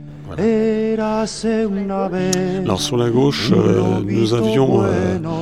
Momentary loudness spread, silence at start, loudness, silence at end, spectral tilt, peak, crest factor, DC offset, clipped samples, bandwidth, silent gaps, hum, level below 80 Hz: 6 LU; 0 s; -17 LUFS; 0 s; -6 dB/octave; -2 dBFS; 16 dB; 0.4%; under 0.1%; 13.5 kHz; none; none; -44 dBFS